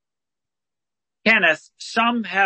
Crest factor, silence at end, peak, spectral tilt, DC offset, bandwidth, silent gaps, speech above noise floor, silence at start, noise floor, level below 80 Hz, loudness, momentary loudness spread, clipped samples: 20 dB; 0 s; -4 dBFS; -3.5 dB/octave; under 0.1%; 8.8 kHz; none; 70 dB; 1.25 s; -90 dBFS; -74 dBFS; -19 LUFS; 10 LU; under 0.1%